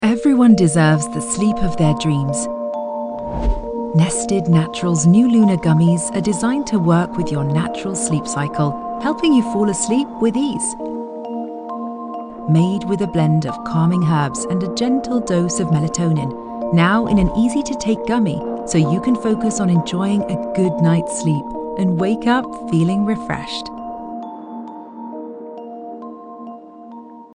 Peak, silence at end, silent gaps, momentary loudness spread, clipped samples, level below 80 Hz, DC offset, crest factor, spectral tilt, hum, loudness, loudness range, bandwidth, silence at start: -2 dBFS; 0.1 s; none; 16 LU; under 0.1%; -36 dBFS; under 0.1%; 16 dB; -6 dB/octave; none; -18 LUFS; 5 LU; 11 kHz; 0 s